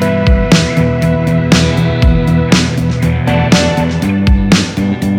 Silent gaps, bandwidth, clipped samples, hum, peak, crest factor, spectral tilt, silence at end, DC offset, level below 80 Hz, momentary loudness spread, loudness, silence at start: none; 15.5 kHz; 0.9%; none; 0 dBFS; 10 dB; -6 dB/octave; 0 s; under 0.1%; -18 dBFS; 4 LU; -11 LUFS; 0 s